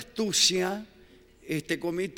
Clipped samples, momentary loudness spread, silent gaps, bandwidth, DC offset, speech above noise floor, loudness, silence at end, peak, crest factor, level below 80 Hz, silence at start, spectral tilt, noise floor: under 0.1%; 13 LU; none; 17 kHz; under 0.1%; 28 dB; -26 LUFS; 0 s; -8 dBFS; 20 dB; -62 dBFS; 0 s; -2.5 dB/octave; -56 dBFS